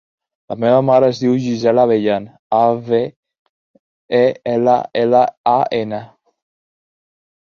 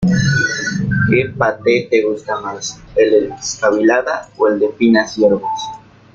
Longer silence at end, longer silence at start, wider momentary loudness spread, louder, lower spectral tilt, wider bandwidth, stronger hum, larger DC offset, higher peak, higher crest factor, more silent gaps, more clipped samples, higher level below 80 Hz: first, 1.4 s vs 0.4 s; first, 0.5 s vs 0 s; about the same, 8 LU vs 9 LU; about the same, -15 LUFS vs -15 LUFS; first, -7 dB/octave vs -5.5 dB/octave; second, 7 kHz vs 7.8 kHz; neither; neither; about the same, -2 dBFS vs -2 dBFS; about the same, 16 dB vs 14 dB; first, 2.39-2.50 s, 3.16-3.23 s, 3.39-4.09 s, 5.37-5.44 s vs none; neither; second, -60 dBFS vs -44 dBFS